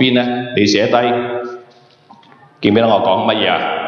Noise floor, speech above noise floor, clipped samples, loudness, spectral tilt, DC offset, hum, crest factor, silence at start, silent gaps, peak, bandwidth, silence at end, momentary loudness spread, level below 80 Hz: -45 dBFS; 32 dB; under 0.1%; -14 LUFS; -5 dB/octave; under 0.1%; none; 14 dB; 0 s; none; 0 dBFS; 7.2 kHz; 0 s; 11 LU; -58 dBFS